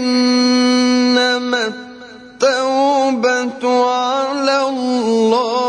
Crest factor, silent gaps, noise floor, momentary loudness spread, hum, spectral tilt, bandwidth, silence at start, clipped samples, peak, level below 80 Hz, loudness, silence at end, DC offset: 12 dB; none; -36 dBFS; 5 LU; none; -3 dB/octave; 10 kHz; 0 s; under 0.1%; -2 dBFS; -64 dBFS; -15 LUFS; 0 s; under 0.1%